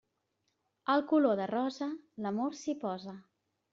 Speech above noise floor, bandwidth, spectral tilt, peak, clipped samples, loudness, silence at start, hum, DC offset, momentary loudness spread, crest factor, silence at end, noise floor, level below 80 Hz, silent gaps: 48 dB; 7.6 kHz; -4.5 dB/octave; -16 dBFS; under 0.1%; -33 LUFS; 0.85 s; none; under 0.1%; 13 LU; 18 dB; 0.5 s; -81 dBFS; -80 dBFS; none